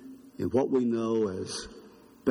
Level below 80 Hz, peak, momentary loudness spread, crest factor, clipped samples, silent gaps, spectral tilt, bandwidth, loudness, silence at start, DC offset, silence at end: -62 dBFS; -12 dBFS; 14 LU; 18 dB; under 0.1%; none; -6 dB/octave; 11.5 kHz; -29 LUFS; 0 s; under 0.1%; 0 s